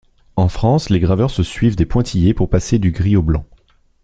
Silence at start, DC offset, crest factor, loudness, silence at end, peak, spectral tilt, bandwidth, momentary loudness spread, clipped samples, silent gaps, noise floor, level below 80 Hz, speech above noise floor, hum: 0.35 s; under 0.1%; 14 dB; -16 LUFS; 0.6 s; 0 dBFS; -7.5 dB/octave; 9 kHz; 4 LU; under 0.1%; none; -52 dBFS; -28 dBFS; 38 dB; none